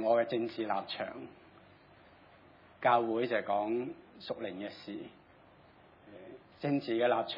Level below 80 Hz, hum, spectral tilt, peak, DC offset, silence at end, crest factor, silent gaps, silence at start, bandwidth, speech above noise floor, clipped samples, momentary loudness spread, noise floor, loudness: -78 dBFS; none; -8 dB/octave; -14 dBFS; under 0.1%; 0 s; 20 dB; none; 0 s; 5.6 kHz; 27 dB; under 0.1%; 22 LU; -60 dBFS; -34 LUFS